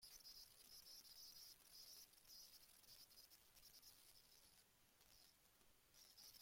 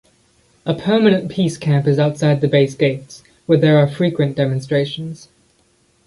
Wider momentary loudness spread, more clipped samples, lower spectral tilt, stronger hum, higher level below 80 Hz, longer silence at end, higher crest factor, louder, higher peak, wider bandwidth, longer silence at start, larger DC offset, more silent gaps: second, 7 LU vs 15 LU; neither; second, 0 dB/octave vs -7 dB/octave; neither; second, -86 dBFS vs -56 dBFS; second, 0 s vs 0.9 s; about the same, 20 dB vs 16 dB; second, -63 LUFS vs -16 LUFS; second, -46 dBFS vs -2 dBFS; first, 16.5 kHz vs 11.5 kHz; second, 0 s vs 0.65 s; neither; neither